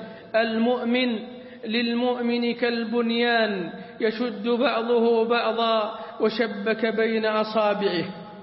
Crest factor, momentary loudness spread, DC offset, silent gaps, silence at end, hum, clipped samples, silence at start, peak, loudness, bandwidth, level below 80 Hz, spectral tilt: 16 dB; 7 LU; under 0.1%; none; 0 s; none; under 0.1%; 0 s; -8 dBFS; -24 LUFS; 5.8 kHz; -70 dBFS; -9.5 dB/octave